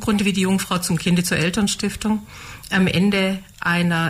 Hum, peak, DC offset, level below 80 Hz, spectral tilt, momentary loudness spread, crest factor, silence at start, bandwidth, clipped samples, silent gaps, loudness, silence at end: none; -8 dBFS; under 0.1%; -44 dBFS; -4.5 dB/octave; 7 LU; 12 dB; 0 s; 16 kHz; under 0.1%; none; -20 LUFS; 0 s